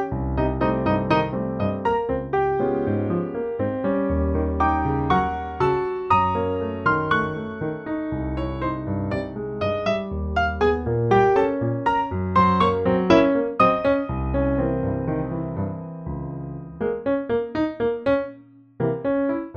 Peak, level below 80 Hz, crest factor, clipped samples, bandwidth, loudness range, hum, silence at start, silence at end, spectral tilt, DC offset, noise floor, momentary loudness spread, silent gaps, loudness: -4 dBFS; -36 dBFS; 18 dB; under 0.1%; 7.2 kHz; 6 LU; none; 0 s; 0 s; -8.5 dB/octave; under 0.1%; -46 dBFS; 9 LU; none; -23 LUFS